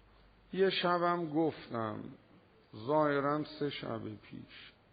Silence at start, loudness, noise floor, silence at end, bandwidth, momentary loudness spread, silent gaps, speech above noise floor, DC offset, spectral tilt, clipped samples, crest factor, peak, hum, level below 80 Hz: 0.5 s; -34 LUFS; -63 dBFS; 0.25 s; 4.9 kHz; 20 LU; none; 28 dB; under 0.1%; -4 dB/octave; under 0.1%; 18 dB; -18 dBFS; none; -70 dBFS